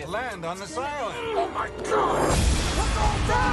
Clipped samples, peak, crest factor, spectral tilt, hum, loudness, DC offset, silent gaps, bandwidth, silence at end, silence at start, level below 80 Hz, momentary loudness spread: under 0.1%; -12 dBFS; 14 dB; -4.5 dB/octave; none; -26 LUFS; under 0.1%; none; 12 kHz; 0 s; 0 s; -30 dBFS; 9 LU